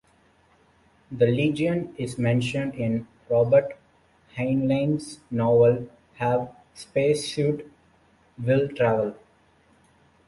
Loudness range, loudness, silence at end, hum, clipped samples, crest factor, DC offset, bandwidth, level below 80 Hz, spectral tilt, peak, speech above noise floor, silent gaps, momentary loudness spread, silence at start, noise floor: 3 LU; -24 LUFS; 1.15 s; none; under 0.1%; 18 dB; under 0.1%; 11.5 kHz; -58 dBFS; -7 dB/octave; -8 dBFS; 38 dB; none; 13 LU; 1.1 s; -61 dBFS